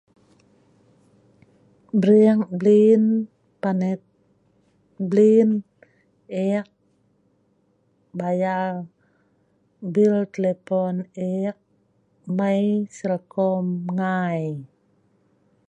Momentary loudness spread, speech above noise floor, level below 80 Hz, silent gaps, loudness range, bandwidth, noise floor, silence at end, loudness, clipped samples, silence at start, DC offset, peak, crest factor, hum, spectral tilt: 16 LU; 45 dB; -72 dBFS; none; 9 LU; 8.4 kHz; -65 dBFS; 1.05 s; -21 LUFS; under 0.1%; 1.95 s; under 0.1%; -6 dBFS; 18 dB; 50 Hz at -50 dBFS; -8.5 dB/octave